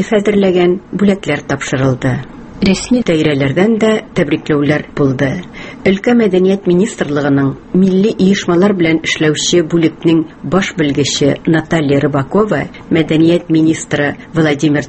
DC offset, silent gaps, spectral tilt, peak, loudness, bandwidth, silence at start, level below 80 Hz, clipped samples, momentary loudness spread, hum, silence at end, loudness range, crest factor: under 0.1%; none; -5.5 dB/octave; 0 dBFS; -13 LUFS; 8.8 kHz; 0 s; -40 dBFS; under 0.1%; 6 LU; none; 0 s; 2 LU; 12 dB